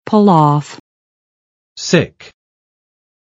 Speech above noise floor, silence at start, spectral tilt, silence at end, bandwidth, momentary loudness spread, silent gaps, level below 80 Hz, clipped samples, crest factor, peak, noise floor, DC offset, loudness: over 78 dB; 0.05 s; -6 dB/octave; 1.25 s; 8 kHz; 15 LU; 0.80-1.76 s; -56 dBFS; under 0.1%; 16 dB; 0 dBFS; under -90 dBFS; under 0.1%; -13 LUFS